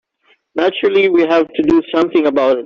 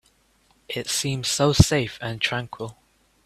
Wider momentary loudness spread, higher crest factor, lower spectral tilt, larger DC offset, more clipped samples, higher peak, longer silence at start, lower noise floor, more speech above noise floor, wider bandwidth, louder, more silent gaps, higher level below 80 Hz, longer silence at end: second, 5 LU vs 17 LU; second, 12 dB vs 24 dB; first, -6 dB/octave vs -4 dB/octave; neither; neither; about the same, -2 dBFS vs 0 dBFS; second, 0.55 s vs 0.7 s; second, -57 dBFS vs -62 dBFS; first, 44 dB vs 40 dB; second, 6.8 kHz vs 15.5 kHz; first, -14 LUFS vs -23 LUFS; neither; second, -50 dBFS vs -40 dBFS; second, 0 s vs 0.55 s